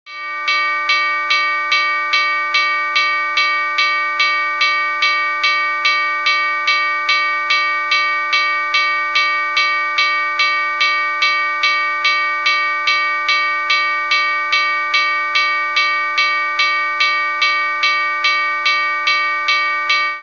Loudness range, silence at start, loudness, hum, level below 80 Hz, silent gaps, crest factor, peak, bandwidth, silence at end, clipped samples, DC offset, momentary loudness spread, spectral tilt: 0 LU; 0.05 s; -14 LUFS; none; -58 dBFS; none; 16 dB; 0 dBFS; 7.4 kHz; 0 s; under 0.1%; 0.2%; 0 LU; 1.5 dB/octave